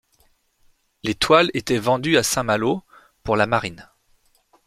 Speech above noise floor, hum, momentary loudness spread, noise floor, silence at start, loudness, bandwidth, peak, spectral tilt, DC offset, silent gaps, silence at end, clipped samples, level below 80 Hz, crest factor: 42 dB; none; 13 LU; -62 dBFS; 1.05 s; -20 LUFS; 15.5 kHz; -2 dBFS; -4 dB/octave; under 0.1%; none; 0.85 s; under 0.1%; -50 dBFS; 20 dB